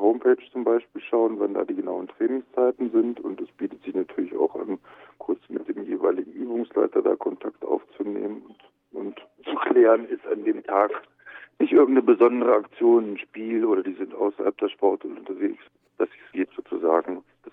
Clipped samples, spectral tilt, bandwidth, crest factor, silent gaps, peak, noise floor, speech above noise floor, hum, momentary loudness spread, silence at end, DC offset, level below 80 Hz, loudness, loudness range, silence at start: under 0.1%; -8.5 dB/octave; 3.8 kHz; 18 dB; none; -6 dBFS; -44 dBFS; 20 dB; none; 15 LU; 0.05 s; under 0.1%; -78 dBFS; -24 LUFS; 7 LU; 0 s